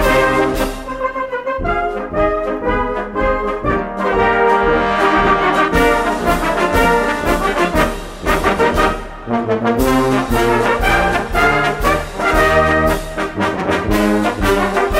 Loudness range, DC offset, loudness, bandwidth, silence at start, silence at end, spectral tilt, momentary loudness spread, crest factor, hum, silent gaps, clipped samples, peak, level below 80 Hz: 4 LU; under 0.1%; -15 LUFS; 16.5 kHz; 0 s; 0 s; -5 dB/octave; 7 LU; 14 dB; none; none; under 0.1%; 0 dBFS; -26 dBFS